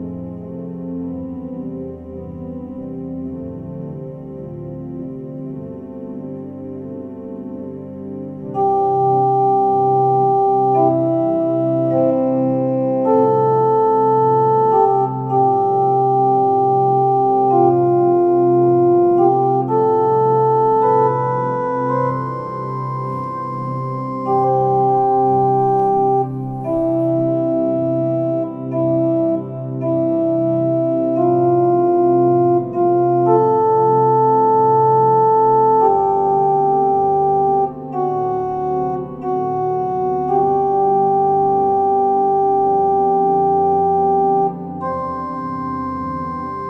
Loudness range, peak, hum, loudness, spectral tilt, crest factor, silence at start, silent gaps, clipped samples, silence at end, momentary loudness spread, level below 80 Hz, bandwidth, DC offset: 15 LU; -2 dBFS; none; -16 LUFS; -11 dB/octave; 14 dB; 0 s; none; under 0.1%; 0 s; 16 LU; -52 dBFS; 5.6 kHz; under 0.1%